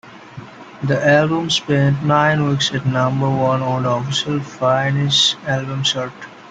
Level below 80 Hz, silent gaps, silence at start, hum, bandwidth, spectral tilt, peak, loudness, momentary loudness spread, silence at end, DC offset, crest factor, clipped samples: -54 dBFS; none; 0.05 s; none; 9.2 kHz; -5 dB/octave; -2 dBFS; -17 LUFS; 13 LU; 0 s; under 0.1%; 16 dB; under 0.1%